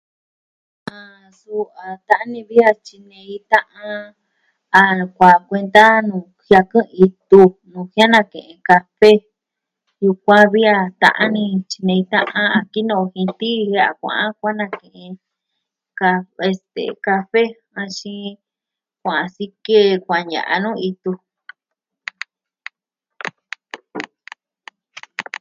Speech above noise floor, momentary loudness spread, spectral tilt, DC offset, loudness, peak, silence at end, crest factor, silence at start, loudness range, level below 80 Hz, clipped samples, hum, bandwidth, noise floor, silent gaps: 70 dB; 22 LU; -6 dB/octave; under 0.1%; -15 LUFS; 0 dBFS; 0.2 s; 18 dB; 0.95 s; 12 LU; -60 dBFS; 0.2%; none; 10.5 kHz; -86 dBFS; none